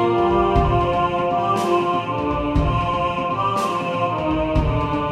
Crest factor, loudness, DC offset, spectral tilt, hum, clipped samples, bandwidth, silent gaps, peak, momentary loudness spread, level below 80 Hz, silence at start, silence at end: 16 dB; -20 LUFS; under 0.1%; -7 dB/octave; none; under 0.1%; 14 kHz; none; -4 dBFS; 4 LU; -30 dBFS; 0 s; 0 s